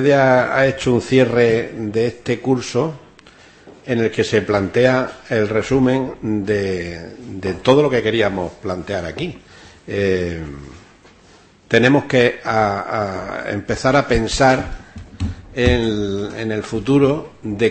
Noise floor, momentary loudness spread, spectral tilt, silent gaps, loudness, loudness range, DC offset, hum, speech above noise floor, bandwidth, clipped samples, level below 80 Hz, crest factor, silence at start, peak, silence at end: -48 dBFS; 13 LU; -6 dB/octave; none; -18 LUFS; 3 LU; under 0.1%; none; 31 dB; 8.8 kHz; under 0.1%; -38 dBFS; 18 dB; 0 s; 0 dBFS; 0 s